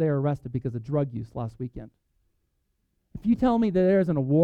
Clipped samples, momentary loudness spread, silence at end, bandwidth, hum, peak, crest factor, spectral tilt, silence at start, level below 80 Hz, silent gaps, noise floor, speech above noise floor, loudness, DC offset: under 0.1%; 16 LU; 0 s; 6.6 kHz; none; -10 dBFS; 16 dB; -10 dB/octave; 0 s; -50 dBFS; none; -74 dBFS; 49 dB; -26 LUFS; under 0.1%